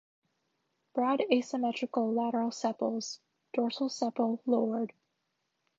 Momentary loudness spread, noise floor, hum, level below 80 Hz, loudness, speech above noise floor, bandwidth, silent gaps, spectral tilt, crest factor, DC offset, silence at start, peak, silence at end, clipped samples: 9 LU; -81 dBFS; none; -84 dBFS; -32 LUFS; 50 dB; 7.8 kHz; none; -4.5 dB/octave; 22 dB; under 0.1%; 0.95 s; -10 dBFS; 0.9 s; under 0.1%